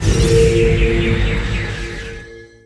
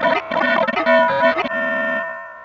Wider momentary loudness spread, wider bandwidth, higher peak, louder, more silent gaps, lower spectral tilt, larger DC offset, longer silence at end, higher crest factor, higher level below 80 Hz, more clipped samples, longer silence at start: first, 16 LU vs 7 LU; first, 11 kHz vs 7.2 kHz; first, 0 dBFS vs -4 dBFS; about the same, -16 LUFS vs -17 LUFS; neither; about the same, -6 dB/octave vs -5.5 dB/octave; neither; first, 0.2 s vs 0 s; about the same, 16 dB vs 16 dB; first, -20 dBFS vs -58 dBFS; neither; about the same, 0 s vs 0 s